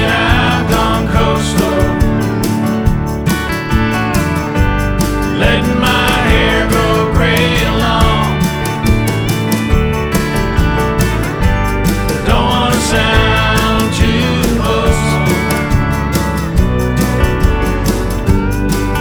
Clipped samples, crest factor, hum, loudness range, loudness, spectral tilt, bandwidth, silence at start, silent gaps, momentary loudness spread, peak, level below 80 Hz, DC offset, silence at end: under 0.1%; 12 dB; none; 2 LU; -13 LUFS; -5.5 dB/octave; over 20 kHz; 0 s; none; 4 LU; 0 dBFS; -18 dBFS; under 0.1%; 0 s